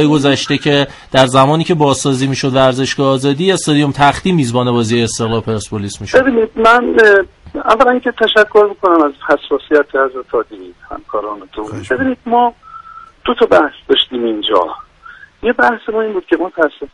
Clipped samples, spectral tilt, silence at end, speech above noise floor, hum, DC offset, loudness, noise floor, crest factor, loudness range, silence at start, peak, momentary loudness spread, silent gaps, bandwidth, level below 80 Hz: under 0.1%; -5 dB/octave; 0.05 s; 26 dB; none; under 0.1%; -13 LUFS; -38 dBFS; 12 dB; 6 LU; 0 s; 0 dBFS; 12 LU; none; 11.5 kHz; -42 dBFS